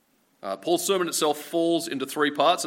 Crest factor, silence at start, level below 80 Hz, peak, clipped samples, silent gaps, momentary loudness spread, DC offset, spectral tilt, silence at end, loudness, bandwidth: 18 dB; 0.45 s; -82 dBFS; -8 dBFS; under 0.1%; none; 10 LU; under 0.1%; -3 dB/octave; 0 s; -25 LUFS; 16.5 kHz